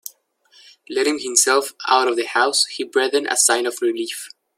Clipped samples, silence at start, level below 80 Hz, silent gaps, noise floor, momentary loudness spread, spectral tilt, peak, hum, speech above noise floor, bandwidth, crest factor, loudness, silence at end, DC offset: under 0.1%; 0.05 s; -76 dBFS; none; -55 dBFS; 11 LU; 1 dB/octave; 0 dBFS; none; 36 dB; 16.5 kHz; 20 dB; -18 LUFS; 0.3 s; under 0.1%